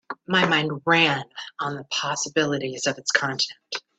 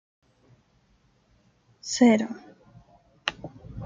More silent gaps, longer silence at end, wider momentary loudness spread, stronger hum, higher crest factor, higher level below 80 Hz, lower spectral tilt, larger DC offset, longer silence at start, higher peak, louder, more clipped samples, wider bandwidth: neither; first, 0.2 s vs 0 s; second, 12 LU vs 22 LU; neither; about the same, 22 dB vs 24 dB; second, -66 dBFS vs -58 dBFS; about the same, -3 dB/octave vs -4 dB/octave; neither; second, 0.1 s vs 1.85 s; about the same, -2 dBFS vs -4 dBFS; about the same, -23 LUFS vs -24 LUFS; neither; about the same, 9.2 kHz vs 9.4 kHz